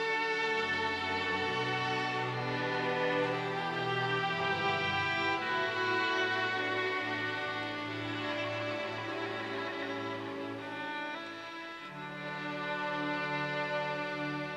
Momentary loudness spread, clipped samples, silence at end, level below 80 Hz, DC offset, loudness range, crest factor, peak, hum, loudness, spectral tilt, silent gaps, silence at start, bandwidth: 9 LU; under 0.1%; 0 s; -74 dBFS; under 0.1%; 7 LU; 14 dB; -20 dBFS; none; -33 LUFS; -5 dB/octave; none; 0 s; 13 kHz